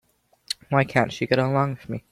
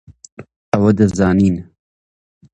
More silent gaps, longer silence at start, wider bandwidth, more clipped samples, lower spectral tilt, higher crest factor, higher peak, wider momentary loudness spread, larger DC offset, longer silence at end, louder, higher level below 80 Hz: second, none vs 0.32-0.37 s, 0.56-0.72 s; first, 0.5 s vs 0.1 s; first, 15.5 kHz vs 8.6 kHz; neither; second, -6 dB/octave vs -8 dB/octave; about the same, 20 dB vs 16 dB; second, -4 dBFS vs 0 dBFS; first, 12 LU vs 7 LU; neither; second, 0.15 s vs 0.9 s; second, -24 LUFS vs -15 LUFS; second, -58 dBFS vs -38 dBFS